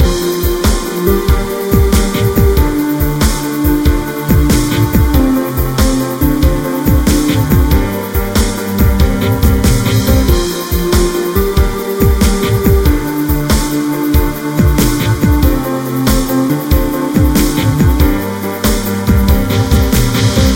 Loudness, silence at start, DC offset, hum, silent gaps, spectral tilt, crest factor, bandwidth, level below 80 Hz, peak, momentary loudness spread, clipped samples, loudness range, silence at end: -12 LUFS; 0 s; under 0.1%; none; none; -6 dB/octave; 10 dB; 17 kHz; -16 dBFS; 0 dBFS; 4 LU; under 0.1%; 1 LU; 0 s